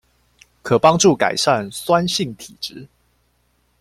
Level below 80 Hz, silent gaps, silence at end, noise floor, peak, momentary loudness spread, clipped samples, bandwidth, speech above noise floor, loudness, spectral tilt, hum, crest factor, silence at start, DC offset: -54 dBFS; none; 0.95 s; -63 dBFS; 0 dBFS; 17 LU; under 0.1%; 15.5 kHz; 46 dB; -17 LUFS; -4 dB/octave; none; 20 dB; 0.65 s; under 0.1%